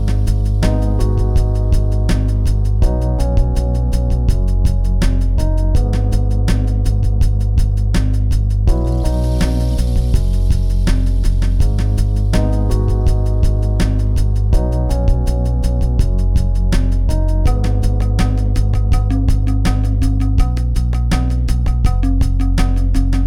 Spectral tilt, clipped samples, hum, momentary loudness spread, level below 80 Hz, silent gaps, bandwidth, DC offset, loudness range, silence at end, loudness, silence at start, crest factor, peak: -7.5 dB/octave; under 0.1%; none; 1 LU; -14 dBFS; none; 11.5 kHz; 0.3%; 0 LU; 0 s; -17 LUFS; 0 s; 10 dB; -2 dBFS